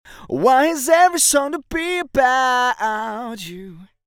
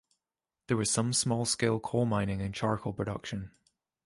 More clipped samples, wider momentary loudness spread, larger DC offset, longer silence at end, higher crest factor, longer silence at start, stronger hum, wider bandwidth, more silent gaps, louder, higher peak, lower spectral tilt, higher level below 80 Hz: neither; first, 15 LU vs 10 LU; neither; second, 0.2 s vs 0.55 s; about the same, 18 dB vs 18 dB; second, 0.1 s vs 0.7 s; neither; first, 20 kHz vs 11.5 kHz; neither; first, -17 LUFS vs -31 LUFS; first, -2 dBFS vs -14 dBFS; second, -2 dB/octave vs -4.5 dB/octave; first, -48 dBFS vs -56 dBFS